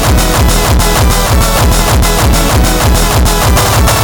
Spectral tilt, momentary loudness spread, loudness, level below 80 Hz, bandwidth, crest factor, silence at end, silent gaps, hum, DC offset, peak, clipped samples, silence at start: -4 dB/octave; 1 LU; -9 LUFS; -12 dBFS; over 20 kHz; 8 dB; 0 s; none; none; under 0.1%; 0 dBFS; under 0.1%; 0 s